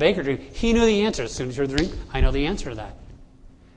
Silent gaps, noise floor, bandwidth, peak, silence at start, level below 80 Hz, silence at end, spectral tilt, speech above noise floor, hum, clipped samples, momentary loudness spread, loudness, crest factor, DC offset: none; -48 dBFS; 10 kHz; -6 dBFS; 0 s; -30 dBFS; 0.3 s; -5.5 dB/octave; 26 dB; none; under 0.1%; 12 LU; -23 LUFS; 18 dB; under 0.1%